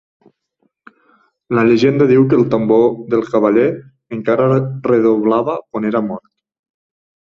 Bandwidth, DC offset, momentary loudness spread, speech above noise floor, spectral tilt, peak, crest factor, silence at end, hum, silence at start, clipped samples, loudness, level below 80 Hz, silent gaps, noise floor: 7 kHz; under 0.1%; 10 LU; 52 dB; -8.5 dB/octave; -2 dBFS; 14 dB; 1.05 s; none; 1.5 s; under 0.1%; -14 LUFS; -56 dBFS; none; -65 dBFS